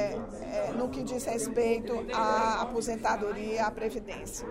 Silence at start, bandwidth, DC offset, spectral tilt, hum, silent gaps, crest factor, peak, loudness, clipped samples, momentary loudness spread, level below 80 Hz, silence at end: 0 s; 16 kHz; under 0.1%; -4 dB/octave; none; none; 16 dB; -16 dBFS; -31 LUFS; under 0.1%; 8 LU; -50 dBFS; 0 s